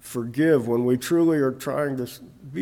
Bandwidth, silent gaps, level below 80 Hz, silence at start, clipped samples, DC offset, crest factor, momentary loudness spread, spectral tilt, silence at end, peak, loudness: 18 kHz; none; -62 dBFS; 0.05 s; under 0.1%; under 0.1%; 14 dB; 14 LU; -6.5 dB/octave; 0 s; -8 dBFS; -23 LUFS